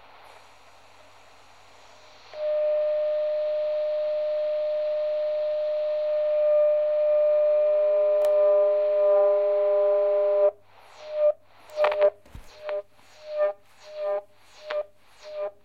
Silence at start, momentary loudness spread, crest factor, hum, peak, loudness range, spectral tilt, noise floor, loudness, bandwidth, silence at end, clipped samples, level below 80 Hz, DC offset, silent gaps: 2.3 s; 14 LU; 18 dB; none; -6 dBFS; 8 LU; -4 dB/octave; -54 dBFS; -24 LUFS; 5.8 kHz; 0.15 s; under 0.1%; -64 dBFS; 0.2%; none